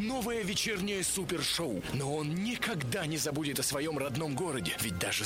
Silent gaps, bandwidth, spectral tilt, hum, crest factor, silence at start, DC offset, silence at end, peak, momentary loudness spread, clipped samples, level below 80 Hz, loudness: none; 16 kHz; -3.5 dB/octave; none; 16 dB; 0 s; under 0.1%; 0 s; -18 dBFS; 3 LU; under 0.1%; -56 dBFS; -33 LUFS